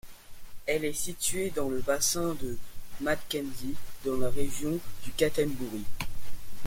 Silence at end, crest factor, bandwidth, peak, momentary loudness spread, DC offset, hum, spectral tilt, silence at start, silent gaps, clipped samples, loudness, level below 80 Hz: 0 s; 14 dB; 17 kHz; -12 dBFS; 13 LU; under 0.1%; none; -3.5 dB/octave; 0.05 s; none; under 0.1%; -32 LUFS; -46 dBFS